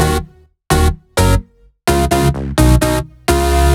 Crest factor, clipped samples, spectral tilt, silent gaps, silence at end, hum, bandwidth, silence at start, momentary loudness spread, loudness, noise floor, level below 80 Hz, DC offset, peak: 14 dB; under 0.1%; -5.5 dB/octave; none; 0 s; none; 18 kHz; 0 s; 6 LU; -15 LUFS; -34 dBFS; -18 dBFS; under 0.1%; 0 dBFS